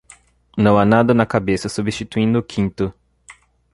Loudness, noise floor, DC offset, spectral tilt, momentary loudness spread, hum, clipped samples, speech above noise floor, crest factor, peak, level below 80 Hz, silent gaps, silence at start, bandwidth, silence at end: -18 LUFS; -49 dBFS; under 0.1%; -6.5 dB/octave; 11 LU; none; under 0.1%; 33 dB; 16 dB; -2 dBFS; -44 dBFS; none; 0.55 s; 11.5 kHz; 0.4 s